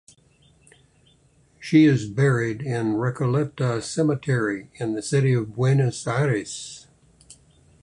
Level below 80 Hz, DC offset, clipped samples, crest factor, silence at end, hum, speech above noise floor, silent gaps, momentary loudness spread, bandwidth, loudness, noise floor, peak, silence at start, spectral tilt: -58 dBFS; under 0.1%; under 0.1%; 18 dB; 0.5 s; none; 37 dB; none; 11 LU; 11 kHz; -23 LUFS; -59 dBFS; -6 dBFS; 1.6 s; -6.5 dB/octave